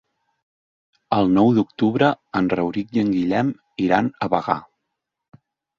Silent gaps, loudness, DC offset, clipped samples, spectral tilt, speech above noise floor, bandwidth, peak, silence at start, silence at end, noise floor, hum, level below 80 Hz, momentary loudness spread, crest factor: none; -20 LUFS; under 0.1%; under 0.1%; -8 dB/octave; 61 dB; 7.2 kHz; 0 dBFS; 1.1 s; 1.2 s; -80 dBFS; none; -56 dBFS; 8 LU; 20 dB